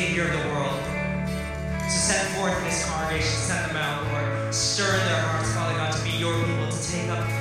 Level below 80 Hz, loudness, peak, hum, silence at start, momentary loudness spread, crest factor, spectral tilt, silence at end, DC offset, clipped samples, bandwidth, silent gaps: -40 dBFS; -25 LUFS; -10 dBFS; none; 0 s; 6 LU; 16 dB; -3.5 dB/octave; 0 s; under 0.1%; under 0.1%; 15.5 kHz; none